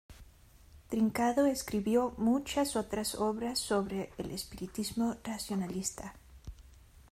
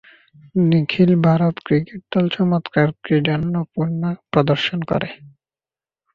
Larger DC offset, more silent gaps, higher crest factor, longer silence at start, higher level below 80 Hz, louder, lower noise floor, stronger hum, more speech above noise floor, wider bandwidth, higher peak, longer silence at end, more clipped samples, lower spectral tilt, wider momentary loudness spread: neither; neither; about the same, 16 dB vs 18 dB; second, 0.1 s vs 0.55 s; about the same, -56 dBFS vs -52 dBFS; second, -33 LUFS vs -19 LUFS; second, -58 dBFS vs under -90 dBFS; neither; second, 26 dB vs over 72 dB; first, 16 kHz vs 6.2 kHz; second, -18 dBFS vs -2 dBFS; second, 0.05 s vs 0.85 s; neither; second, -4.5 dB/octave vs -8.5 dB/octave; first, 12 LU vs 8 LU